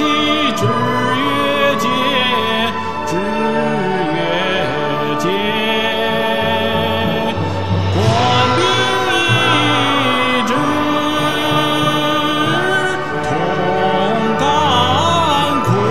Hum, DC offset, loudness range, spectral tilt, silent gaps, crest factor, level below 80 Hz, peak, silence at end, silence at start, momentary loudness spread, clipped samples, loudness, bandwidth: none; 3%; 3 LU; -5 dB/octave; none; 14 dB; -38 dBFS; 0 dBFS; 0 s; 0 s; 5 LU; under 0.1%; -15 LUFS; 16 kHz